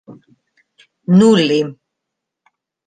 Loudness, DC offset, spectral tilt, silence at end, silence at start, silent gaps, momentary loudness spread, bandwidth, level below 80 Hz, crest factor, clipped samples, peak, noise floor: -13 LUFS; under 0.1%; -6.5 dB/octave; 1.15 s; 0.1 s; none; 16 LU; 9.4 kHz; -62 dBFS; 16 dB; under 0.1%; -2 dBFS; -79 dBFS